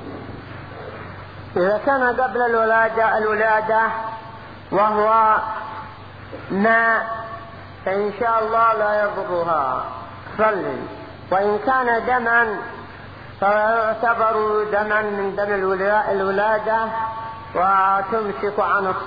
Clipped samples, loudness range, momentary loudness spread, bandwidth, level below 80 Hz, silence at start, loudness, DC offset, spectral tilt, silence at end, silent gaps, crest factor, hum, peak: under 0.1%; 2 LU; 18 LU; 5 kHz; -52 dBFS; 0 s; -19 LUFS; 0.3%; -8 dB/octave; 0 s; none; 16 dB; none; -4 dBFS